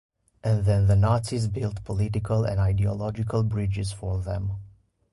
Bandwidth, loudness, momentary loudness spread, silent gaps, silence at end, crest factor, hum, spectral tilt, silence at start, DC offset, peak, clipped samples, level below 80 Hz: 11.5 kHz; -26 LUFS; 10 LU; none; 0.45 s; 14 dB; none; -7.5 dB/octave; 0.45 s; under 0.1%; -12 dBFS; under 0.1%; -38 dBFS